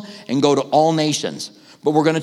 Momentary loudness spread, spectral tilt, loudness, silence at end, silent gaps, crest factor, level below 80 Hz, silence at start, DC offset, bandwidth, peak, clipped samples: 12 LU; -5 dB/octave; -18 LUFS; 0 s; none; 16 dB; -72 dBFS; 0 s; under 0.1%; 13 kHz; -2 dBFS; under 0.1%